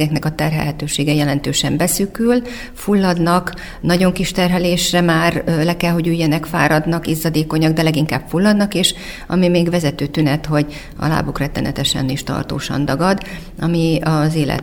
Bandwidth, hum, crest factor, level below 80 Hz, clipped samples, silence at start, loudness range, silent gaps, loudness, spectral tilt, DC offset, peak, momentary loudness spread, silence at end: 19.5 kHz; none; 16 dB; -36 dBFS; under 0.1%; 0 s; 3 LU; none; -17 LUFS; -5 dB/octave; under 0.1%; 0 dBFS; 7 LU; 0 s